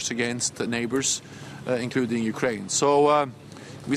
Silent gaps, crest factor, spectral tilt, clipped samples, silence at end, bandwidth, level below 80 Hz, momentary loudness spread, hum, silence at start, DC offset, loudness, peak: none; 18 dB; -3.5 dB/octave; under 0.1%; 0 s; 14.5 kHz; -62 dBFS; 18 LU; none; 0 s; under 0.1%; -24 LUFS; -6 dBFS